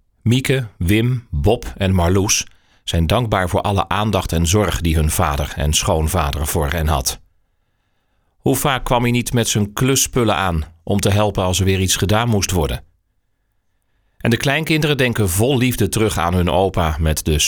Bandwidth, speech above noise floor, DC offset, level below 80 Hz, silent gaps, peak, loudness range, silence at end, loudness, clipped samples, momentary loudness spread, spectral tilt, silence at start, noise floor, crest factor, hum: over 20 kHz; 49 dB; under 0.1%; -30 dBFS; none; -2 dBFS; 3 LU; 0 s; -17 LUFS; under 0.1%; 4 LU; -4.5 dB/octave; 0.25 s; -66 dBFS; 14 dB; none